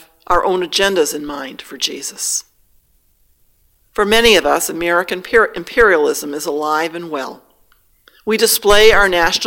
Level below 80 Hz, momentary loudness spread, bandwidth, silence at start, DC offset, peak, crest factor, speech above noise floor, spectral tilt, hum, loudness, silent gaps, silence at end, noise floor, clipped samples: -36 dBFS; 15 LU; 17.5 kHz; 0.3 s; under 0.1%; 0 dBFS; 16 dB; 42 dB; -2 dB/octave; none; -14 LUFS; none; 0 s; -57 dBFS; under 0.1%